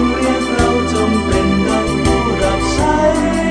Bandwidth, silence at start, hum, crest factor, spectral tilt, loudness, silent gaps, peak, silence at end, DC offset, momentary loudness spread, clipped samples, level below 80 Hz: 10.5 kHz; 0 s; none; 14 dB; -5.5 dB/octave; -14 LUFS; none; 0 dBFS; 0 s; under 0.1%; 2 LU; under 0.1%; -26 dBFS